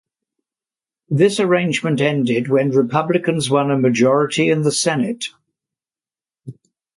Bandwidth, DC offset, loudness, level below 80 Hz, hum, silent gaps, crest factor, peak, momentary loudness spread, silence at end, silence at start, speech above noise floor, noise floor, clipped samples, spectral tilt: 11.5 kHz; under 0.1%; -17 LUFS; -62 dBFS; none; none; 16 dB; -2 dBFS; 5 LU; 0.45 s; 1.1 s; over 74 dB; under -90 dBFS; under 0.1%; -5 dB/octave